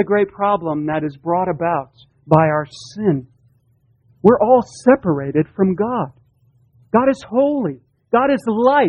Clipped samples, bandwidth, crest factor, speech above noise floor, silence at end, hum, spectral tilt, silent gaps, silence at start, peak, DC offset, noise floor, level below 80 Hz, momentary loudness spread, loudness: under 0.1%; 10 kHz; 18 dB; 42 dB; 0 s; none; -8 dB/octave; none; 0 s; 0 dBFS; under 0.1%; -58 dBFS; -54 dBFS; 8 LU; -17 LUFS